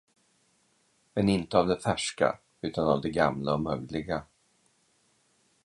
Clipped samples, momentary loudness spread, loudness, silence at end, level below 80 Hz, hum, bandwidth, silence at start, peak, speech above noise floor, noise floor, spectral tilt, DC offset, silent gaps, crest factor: under 0.1%; 10 LU; -29 LUFS; 1.4 s; -54 dBFS; none; 11.5 kHz; 1.15 s; -8 dBFS; 41 dB; -69 dBFS; -5.5 dB/octave; under 0.1%; none; 22 dB